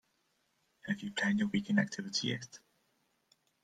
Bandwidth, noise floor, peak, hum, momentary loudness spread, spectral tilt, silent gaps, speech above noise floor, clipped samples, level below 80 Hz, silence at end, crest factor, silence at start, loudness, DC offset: 9.2 kHz; -77 dBFS; -16 dBFS; none; 11 LU; -4.5 dB/octave; none; 43 dB; under 0.1%; -74 dBFS; 1.05 s; 22 dB; 0.85 s; -34 LUFS; under 0.1%